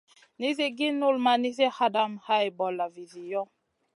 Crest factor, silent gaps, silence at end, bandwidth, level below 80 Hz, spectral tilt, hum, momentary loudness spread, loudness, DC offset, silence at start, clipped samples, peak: 18 dB; none; 0.55 s; 11.5 kHz; -84 dBFS; -4 dB/octave; none; 10 LU; -27 LUFS; under 0.1%; 0.4 s; under 0.1%; -10 dBFS